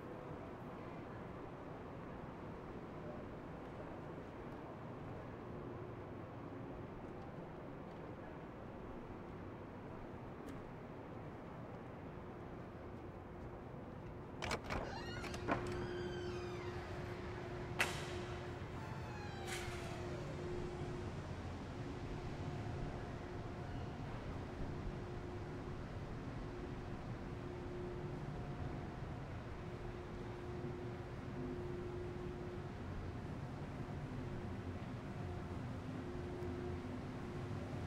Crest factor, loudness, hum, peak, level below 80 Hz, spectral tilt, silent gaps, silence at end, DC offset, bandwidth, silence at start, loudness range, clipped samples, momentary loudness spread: 28 dB; -47 LUFS; none; -18 dBFS; -58 dBFS; -6 dB/octave; none; 0 s; under 0.1%; 15.5 kHz; 0 s; 7 LU; under 0.1%; 7 LU